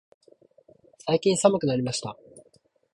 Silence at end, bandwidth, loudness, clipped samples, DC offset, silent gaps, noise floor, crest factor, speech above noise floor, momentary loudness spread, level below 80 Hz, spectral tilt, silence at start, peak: 0.55 s; 11.5 kHz; -24 LUFS; under 0.1%; under 0.1%; none; -63 dBFS; 22 dB; 40 dB; 17 LU; -64 dBFS; -5 dB/octave; 1.05 s; -4 dBFS